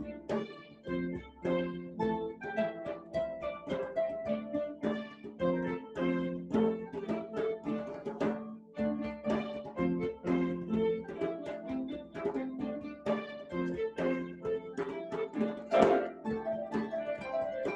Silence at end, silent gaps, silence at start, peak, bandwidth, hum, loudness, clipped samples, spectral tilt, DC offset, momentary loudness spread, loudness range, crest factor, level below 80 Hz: 0 s; none; 0 s; -10 dBFS; 8.4 kHz; none; -35 LUFS; under 0.1%; -7.5 dB/octave; under 0.1%; 7 LU; 4 LU; 24 dB; -62 dBFS